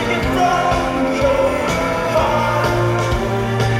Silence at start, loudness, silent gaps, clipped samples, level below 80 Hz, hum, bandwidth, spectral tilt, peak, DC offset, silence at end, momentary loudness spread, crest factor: 0 s; -17 LUFS; none; under 0.1%; -30 dBFS; none; 16 kHz; -5.5 dB/octave; -4 dBFS; under 0.1%; 0 s; 3 LU; 14 dB